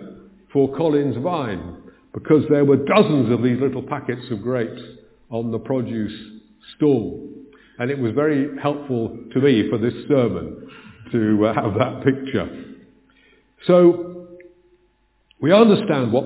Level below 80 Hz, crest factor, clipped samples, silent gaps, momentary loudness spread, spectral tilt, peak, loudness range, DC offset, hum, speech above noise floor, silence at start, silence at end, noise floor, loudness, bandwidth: -52 dBFS; 20 dB; under 0.1%; none; 17 LU; -11.5 dB/octave; 0 dBFS; 6 LU; under 0.1%; none; 43 dB; 0 s; 0 s; -62 dBFS; -20 LUFS; 4 kHz